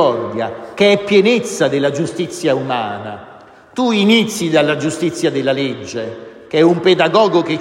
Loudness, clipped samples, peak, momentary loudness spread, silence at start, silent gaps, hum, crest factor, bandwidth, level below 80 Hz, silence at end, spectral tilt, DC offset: -15 LUFS; under 0.1%; 0 dBFS; 13 LU; 0 s; none; none; 14 dB; 16 kHz; -60 dBFS; 0 s; -5 dB/octave; under 0.1%